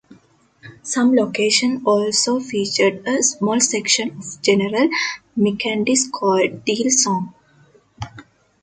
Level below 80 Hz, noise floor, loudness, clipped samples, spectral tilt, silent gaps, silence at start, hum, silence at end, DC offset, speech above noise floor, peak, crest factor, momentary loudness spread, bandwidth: -58 dBFS; -54 dBFS; -18 LUFS; under 0.1%; -3 dB/octave; none; 0.65 s; none; 0.4 s; under 0.1%; 36 dB; 0 dBFS; 20 dB; 9 LU; 9.6 kHz